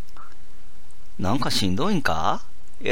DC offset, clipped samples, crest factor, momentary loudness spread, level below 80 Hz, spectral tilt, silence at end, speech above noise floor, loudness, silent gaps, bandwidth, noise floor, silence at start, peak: 9%; under 0.1%; 22 dB; 9 LU; -46 dBFS; -4.5 dB/octave; 0 s; 26 dB; -25 LUFS; none; 16 kHz; -50 dBFS; 0.1 s; -6 dBFS